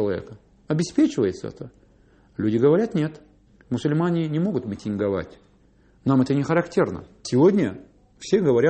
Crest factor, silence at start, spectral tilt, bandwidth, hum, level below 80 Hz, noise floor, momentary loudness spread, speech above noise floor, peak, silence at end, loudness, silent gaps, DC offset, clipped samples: 16 dB; 0 s; -7.5 dB/octave; 8.8 kHz; none; -56 dBFS; -57 dBFS; 16 LU; 35 dB; -6 dBFS; 0 s; -23 LUFS; none; under 0.1%; under 0.1%